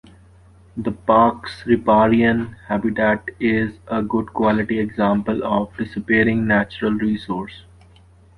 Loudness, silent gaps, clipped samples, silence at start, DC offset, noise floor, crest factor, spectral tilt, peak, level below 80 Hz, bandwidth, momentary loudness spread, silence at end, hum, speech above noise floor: -19 LUFS; none; under 0.1%; 0.75 s; under 0.1%; -49 dBFS; 18 dB; -8 dB/octave; -2 dBFS; -46 dBFS; 5.4 kHz; 12 LU; 0.75 s; none; 30 dB